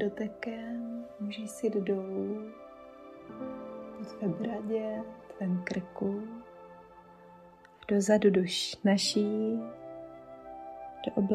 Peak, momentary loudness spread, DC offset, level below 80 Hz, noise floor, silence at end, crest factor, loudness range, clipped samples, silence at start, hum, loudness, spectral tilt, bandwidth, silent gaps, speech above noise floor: -12 dBFS; 21 LU; under 0.1%; -68 dBFS; -55 dBFS; 0 s; 20 dB; 8 LU; under 0.1%; 0 s; none; -32 LUFS; -5 dB/octave; 14 kHz; none; 24 dB